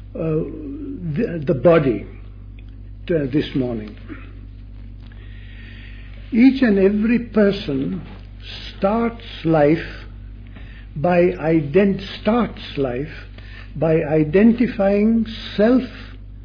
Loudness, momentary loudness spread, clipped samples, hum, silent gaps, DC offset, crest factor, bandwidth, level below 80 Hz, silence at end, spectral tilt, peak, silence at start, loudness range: -19 LUFS; 24 LU; under 0.1%; none; none; under 0.1%; 18 dB; 5.4 kHz; -38 dBFS; 0 s; -9 dB/octave; -2 dBFS; 0 s; 8 LU